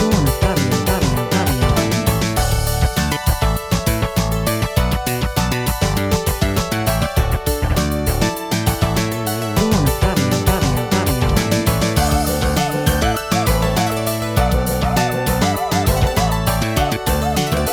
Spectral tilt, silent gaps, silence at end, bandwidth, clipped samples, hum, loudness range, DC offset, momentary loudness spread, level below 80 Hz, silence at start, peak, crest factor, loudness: -5 dB/octave; none; 0 s; 19.5 kHz; under 0.1%; none; 2 LU; under 0.1%; 3 LU; -24 dBFS; 0 s; -2 dBFS; 16 dB; -18 LUFS